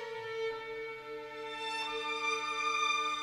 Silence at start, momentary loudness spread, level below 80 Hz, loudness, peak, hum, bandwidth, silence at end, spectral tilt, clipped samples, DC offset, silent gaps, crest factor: 0 s; 12 LU; -72 dBFS; -35 LUFS; -20 dBFS; none; 15.5 kHz; 0 s; -0.5 dB/octave; under 0.1%; under 0.1%; none; 16 dB